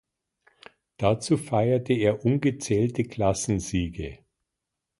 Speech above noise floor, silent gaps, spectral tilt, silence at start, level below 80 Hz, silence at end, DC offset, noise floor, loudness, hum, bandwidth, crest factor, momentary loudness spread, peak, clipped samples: 60 dB; none; -6 dB/octave; 1 s; -46 dBFS; 0.85 s; under 0.1%; -84 dBFS; -25 LUFS; none; 11.5 kHz; 18 dB; 6 LU; -8 dBFS; under 0.1%